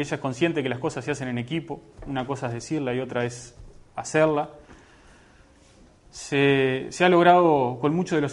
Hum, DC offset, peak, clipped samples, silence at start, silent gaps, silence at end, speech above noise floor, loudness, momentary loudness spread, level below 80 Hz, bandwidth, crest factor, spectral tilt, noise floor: none; under 0.1%; -2 dBFS; under 0.1%; 0 s; none; 0 s; 31 dB; -23 LUFS; 18 LU; -54 dBFS; 11.5 kHz; 22 dB; -5.5 dB/octave; -54 dBFS